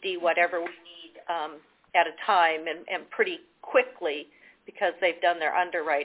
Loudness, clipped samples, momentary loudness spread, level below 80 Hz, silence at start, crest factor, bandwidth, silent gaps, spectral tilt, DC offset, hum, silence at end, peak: -27 LUFS; under 0.1%; 14 LU; -76 dBFS; 0 s; 20 dB; 4 kHz; none; -5.5 dB/octave; under 0.1%; none; 0 s; -8 dBFS